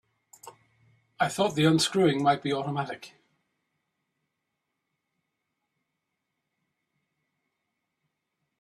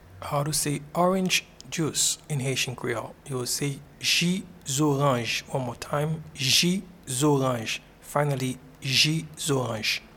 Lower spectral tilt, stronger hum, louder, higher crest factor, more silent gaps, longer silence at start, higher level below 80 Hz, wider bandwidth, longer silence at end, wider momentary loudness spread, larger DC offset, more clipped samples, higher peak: first, -5 dB/octave vs -3.5 dB/octave; neither; about the same, -26 LUFS vs -26 LUFS; about the same, 22 dB vs 18 dB; neither; first, 0.45 s vs 0.05 s; second, -70 dBFS vs -56 dBFS; second, 14 kHz vs 18 kHz; first, 5.5 s vs 0 s; about the same, 11 LU vs 11 LU; neither; neither; about the same, -10 dBFS vs -8 dBFS